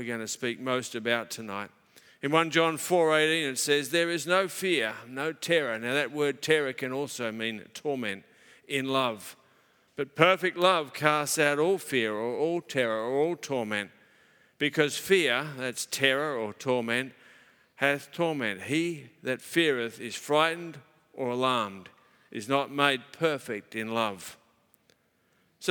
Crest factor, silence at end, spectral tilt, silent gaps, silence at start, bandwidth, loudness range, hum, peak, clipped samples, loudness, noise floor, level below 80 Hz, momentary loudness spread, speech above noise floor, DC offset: 26 dB; 0 s; -3.5 dB/octave; none; 0 s; 19.5 kHz; 5 LU; none; -2 dBFS; under 0.1%; -28 LUFS; -69 dBFS; -82 dBFS; 12 LU; 41 dB; under 0.1%